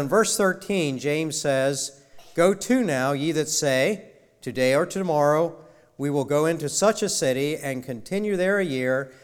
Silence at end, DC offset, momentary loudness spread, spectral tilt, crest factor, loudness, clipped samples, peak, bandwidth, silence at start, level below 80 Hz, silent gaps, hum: 0.1 s; under 0.1%; 9 LU; -4 dB/octave; 16 dB; -23 LUFS; under 0.1%; -8 dBFS; 18.5 kHz; 0 s; -62 dBFS; none; none